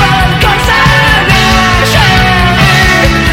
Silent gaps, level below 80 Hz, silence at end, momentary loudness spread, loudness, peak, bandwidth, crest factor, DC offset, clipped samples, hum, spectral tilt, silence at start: none; -16 dBFS; 0 s; 2 LU; -6 LUFS; 0 dBFS; 17 kHz; 6 dB; under 0.1%; 1%; none; -4.5 dB/octave; 0 s